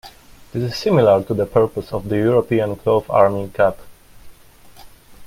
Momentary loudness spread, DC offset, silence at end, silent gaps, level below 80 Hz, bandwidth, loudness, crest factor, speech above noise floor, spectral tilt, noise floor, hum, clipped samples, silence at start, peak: 9 LU; under 0.1%; 0 s; none; -48 dBFS; 16.5 kHz; -18 LUFS; 18 dB; 28 dB; -7.5 dB/octave; -45 dBFS; none; under 0.1%; 0.05 s; 0 dBFS